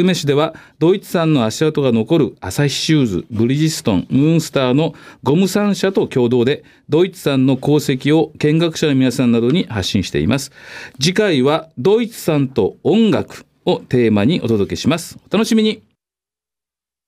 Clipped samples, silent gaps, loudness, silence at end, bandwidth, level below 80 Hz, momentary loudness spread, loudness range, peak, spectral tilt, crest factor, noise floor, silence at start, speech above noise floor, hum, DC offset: under 0.1%; none; -16 LUFS; 1.3 s; 16 kHz; -48 dBFS; 6 LU; 1 LU; -2 dBFS; -6 dB/octave; 12 dB; -89 dBFS; 0 s; 74 dB; none; under 0.1%